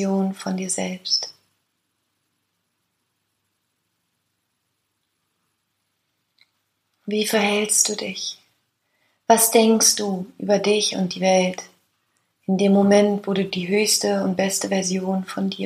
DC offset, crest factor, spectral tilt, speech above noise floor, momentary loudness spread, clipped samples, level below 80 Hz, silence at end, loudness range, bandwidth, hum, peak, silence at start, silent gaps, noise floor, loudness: under 0.1%; 20 dB; -3.5 dB/octave; 54 dB; 12 LU; under 0.1%; -68 dBFS; 0 s; 10 LU; 15.5 kHz; none; -2 dBFS; 0 s; none; -74 dBFS; -20 LUFS